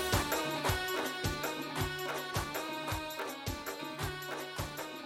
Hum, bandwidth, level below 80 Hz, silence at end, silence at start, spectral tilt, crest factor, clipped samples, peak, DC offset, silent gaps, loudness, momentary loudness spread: none; 16.5 kHz; -50 dBFS; 0 s; 0 s; -3.5 dB/octave; 20 dB; under 0.1%; -16 dBFS; under 0.1%; none; -36 LUFS; 7 LU